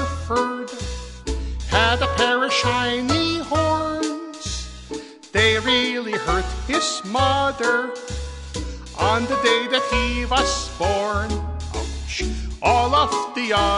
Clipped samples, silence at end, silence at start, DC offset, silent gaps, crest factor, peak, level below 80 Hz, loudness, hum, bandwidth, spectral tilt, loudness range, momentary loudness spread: under 0.1%; 0 s; 0 s; under 0.1%; none; 18 dB; -2 dBFS; -32 dBFS; -21 LUFS; none; 11.5 kHz; -4 dB/octave; 2 LU; 13 LU